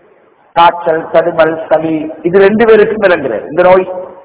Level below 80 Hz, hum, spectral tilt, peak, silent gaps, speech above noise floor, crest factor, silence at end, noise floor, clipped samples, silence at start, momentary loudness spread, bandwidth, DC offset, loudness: -46 dBFS; none; -9.5 dB/octave; 0 dBFS; none; 37 dB; 10 dB; 0.1 s; -46 dBFS; 4%; 0.55 s; 9 LU; 4 kHz; under 0.1%; -9 LUFS